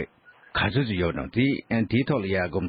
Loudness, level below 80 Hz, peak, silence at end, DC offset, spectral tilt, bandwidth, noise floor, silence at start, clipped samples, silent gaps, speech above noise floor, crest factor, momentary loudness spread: -25 LUFS; -48 dBFS; -12 dBFS; 0 s; under 0.1%; -11 dB/octave; 5 kHz; -53 dBFS; 0 s; under 0.1%; none; 28 dB; 14 dB; 3 LU